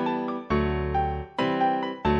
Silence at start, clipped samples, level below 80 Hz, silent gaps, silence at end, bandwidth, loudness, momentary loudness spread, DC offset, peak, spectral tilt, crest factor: 0 s; under 0.1%; -38 dBFS; none; 0 s; 7.8 kHz; -27 LUFS; 4 LU; under 0.1%; -10 dBFS; -8 dB/octave; 14 dB